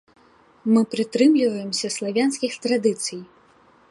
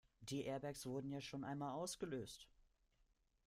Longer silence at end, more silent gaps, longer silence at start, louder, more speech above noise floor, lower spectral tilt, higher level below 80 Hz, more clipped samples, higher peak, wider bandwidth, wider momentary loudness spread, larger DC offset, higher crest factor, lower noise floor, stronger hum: second, 0.65 s vs 1 s; neither; first, 0.65 s vs 0.2 s; first, -22 LUFS vs -48 LUFS; about the same, 34 dB vs 33 dB; about the same, -4 dB/octave vs -5 dB/octave; about the same, -74 dBFS vs -74 dBFS; neither; first, -6 dBFS vs -34 dBFS; second, 11.5 kHz vs 15.5 kHz; first, 11 LU vs 7 LU; neither; about the same, 16 dB vs 16 dB; second, -55 dBFS vs -80 dBFS; neither